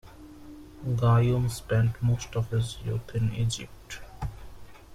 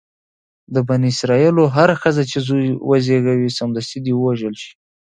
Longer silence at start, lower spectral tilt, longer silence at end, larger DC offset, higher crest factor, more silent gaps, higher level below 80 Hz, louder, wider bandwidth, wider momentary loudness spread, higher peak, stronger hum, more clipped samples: second, 0.05 s vs 0.7 s; about the same, -6.5 dB/octave vs -6.5 dB/octave; second, 0 s vs 0.45 s; neither; about the same, 16 dB vs 16 dB; neither; first, -46 dBFS vs -56 dBFS; second, -28 LUFS vs -17 LUFS; first, 13 kHz vs 9.6 kHz; first, 23 LU vs 10 LU; second, -12 dBFS vs 0 dBFS; neither; neither